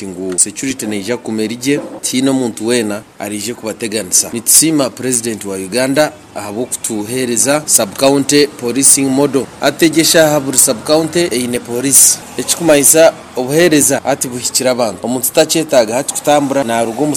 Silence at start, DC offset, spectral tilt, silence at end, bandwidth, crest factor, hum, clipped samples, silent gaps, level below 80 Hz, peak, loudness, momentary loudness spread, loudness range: 0 s; under 0.1%; -2.5 dB/octave; 0 s; over 20 kHz; 12 dB; none; 0.3%; none; -52 dBFS; 0 dBFS; -12 LUFS; 12 LU; 6 LU